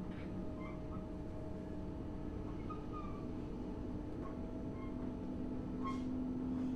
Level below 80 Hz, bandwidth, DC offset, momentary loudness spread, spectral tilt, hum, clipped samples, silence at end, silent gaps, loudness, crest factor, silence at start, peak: -52 dBFS; 9.4 kHz; under 0.1%; 5 LU; -8.5 dB/octave; none; under 0.1%; 0 s; none; -45 LUFS; 12 dB; 0 s; -30 dBFS